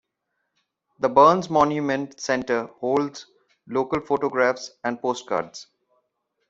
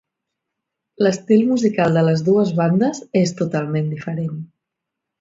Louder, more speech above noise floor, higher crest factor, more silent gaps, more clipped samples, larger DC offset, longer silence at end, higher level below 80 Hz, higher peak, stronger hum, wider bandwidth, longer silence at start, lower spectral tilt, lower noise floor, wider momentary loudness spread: second, -23 LUFS vs -18 LUFS; second, 55 dB vs 64 dB; first, 22 dB vs 16 dB; neither; neither; neither; about the same, 0.85 s vs 0.75 s; about the same, -64 dBFS vs -60 dBFS; about the same, -2 dBFS vs -4 dBFS; neither; about the same, 8 kHz vs 7.8 kHz; about the same, 1 s vs 1 s; second, -5 dB/octave vs -7 dB/octave; about the same, -78 dBFS vs -81 dBFS; first, 13 LU vs 9 LU